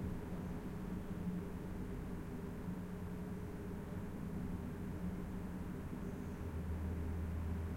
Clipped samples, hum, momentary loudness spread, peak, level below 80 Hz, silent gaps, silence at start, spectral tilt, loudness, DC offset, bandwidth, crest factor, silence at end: under 0.1%; none; 4 LU; -30 dBFS; -52 dBFS; none; 0 s; -8 dB/octave; -45 LUFS; under 0.1%; 16.5 kHz; 12 dB; 0 s